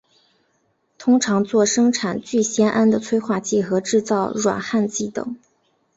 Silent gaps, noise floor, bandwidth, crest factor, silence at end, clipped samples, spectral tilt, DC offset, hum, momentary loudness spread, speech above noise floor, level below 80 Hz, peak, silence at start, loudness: none; -66 dBFS; 8 kHz; 16 dB; 0.6 s; under 0.1%; -4.5 dB/octave; under 0.1%; none; 9 LU; 47 dB; -60 dBFS; -4 dBFS; 1 s; -20 LUFS